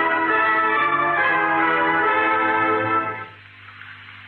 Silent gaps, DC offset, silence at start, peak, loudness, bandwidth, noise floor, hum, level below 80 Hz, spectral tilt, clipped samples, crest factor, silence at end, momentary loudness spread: none; under 0.1%; 0 s; -8 dBFS; -18 LUFS; 5 kHz; -43 dBFS; none; -64 dBFS; -7 dB/octave; under 0.1%; 14 dB; 0 s; 18 LU